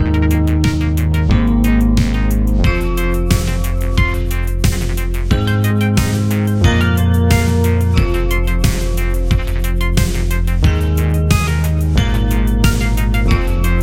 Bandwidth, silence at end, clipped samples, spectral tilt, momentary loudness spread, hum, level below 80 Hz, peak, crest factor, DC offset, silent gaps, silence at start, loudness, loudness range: 17 kHz; 0 s; under 0.1%; -6 dB/octave; 4 LU; none; -16 dBFS; 0 dBFS; 14 dB; under 0.1%; none; 0 s; -15 LUFS; 2 LU